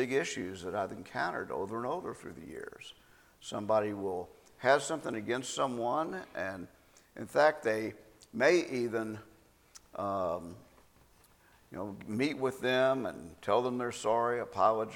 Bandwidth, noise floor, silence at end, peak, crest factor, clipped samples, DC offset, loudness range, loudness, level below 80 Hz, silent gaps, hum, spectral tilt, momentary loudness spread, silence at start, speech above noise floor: 17.5 kHz; -63 dBFS; 0 s; -12 dBFS; 22 dB; under 0.1%; under 0.1%; 7 LU; -33 LUFS; -68 dBFS; none; none; -4.5 dB/octave; 18 LU; 0 s; 31 dB